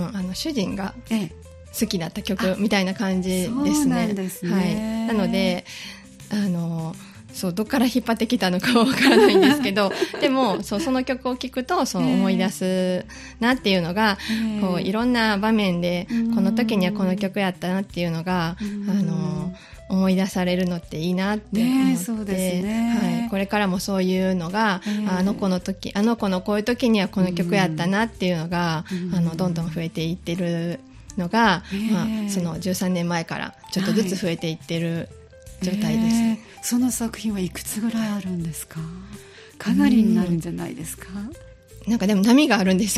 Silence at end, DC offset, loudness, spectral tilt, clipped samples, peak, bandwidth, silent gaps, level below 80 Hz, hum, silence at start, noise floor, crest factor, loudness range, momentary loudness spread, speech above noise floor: 0 s; under 0.1%; -22 LUFS; -5.5 dB/octave; under 0.1%; -4 dBFS; 14.5 kHz; none; -48 dBFS; none; 0 s; -42 dBFS; 18 dB; 6 LU; 11 LU; 21 dB